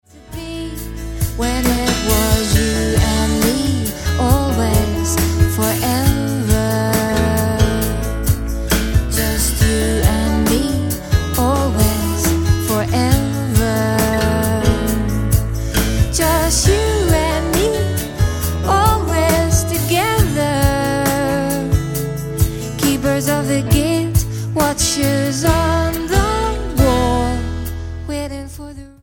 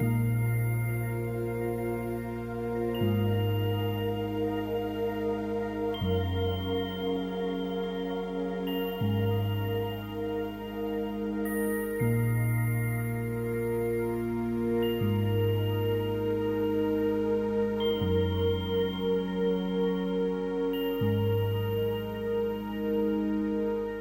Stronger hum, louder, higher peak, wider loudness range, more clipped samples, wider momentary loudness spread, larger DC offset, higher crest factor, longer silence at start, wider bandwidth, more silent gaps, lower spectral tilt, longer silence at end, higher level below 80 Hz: neither; first, -16 LUFS vs -30 LUFS; first, 0 dBFS vs -16 dBFS; about the same, 2 LU vs 3 LU; neither; about the same, 6 LU vs 5 LU; neither; about the same, 16 dB vs 12 dB; first, 0.15 s vs 0 s; about the same, 17.5 kHz vs 16 kHz; neither; second, -5 dB/octave vs -7.5 dB/octave; first, 0.15 s vs 0 s; first, -22 dBFS vs -50 dBFS